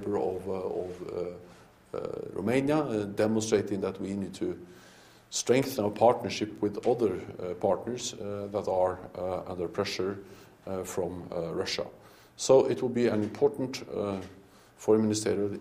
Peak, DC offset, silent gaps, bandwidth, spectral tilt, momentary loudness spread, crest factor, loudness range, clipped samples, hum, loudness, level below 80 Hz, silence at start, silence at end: -8 dBFS; under 0.1%; none; 15.5 kHz; -5 dB/octave; 12 LU; 22 dB; 4 LU; under 0.1%; none; -30 LUFS; -64 dBFS; 0 s; 0 s